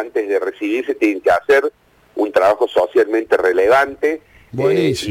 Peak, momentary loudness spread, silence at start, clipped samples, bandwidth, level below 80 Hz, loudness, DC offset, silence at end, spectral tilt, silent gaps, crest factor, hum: -6 dBFS; 8 LU; 0 s; under 0.1%; 16.5 kHz; -54 dBFS; -16 LUFS; under 0.1%; 0 s; -5.5 dB/octave; none; 10 dB; none